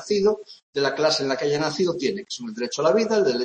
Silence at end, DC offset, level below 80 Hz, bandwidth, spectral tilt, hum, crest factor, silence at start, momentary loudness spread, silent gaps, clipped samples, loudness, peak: 0 s; under 0.1%; -64 dBFS; 8.8 kHz; -4 dB/octave; none; 16 dB; 0 s; 11 LU; 0.63-0.73 s; under 0.1%; -23 LUFS; -6 dBFS